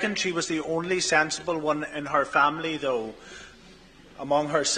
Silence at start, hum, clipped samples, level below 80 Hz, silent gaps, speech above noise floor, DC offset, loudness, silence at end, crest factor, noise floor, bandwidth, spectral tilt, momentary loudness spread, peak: 0 s; none; under 0.1%; -58 dBFS; none; 25 dB; under 0.1%; -25 LUFS; 0 s; 20 dB; -51 dBFS; 10 kHz; -3 dB/octave; 16 LU; -6 dBFS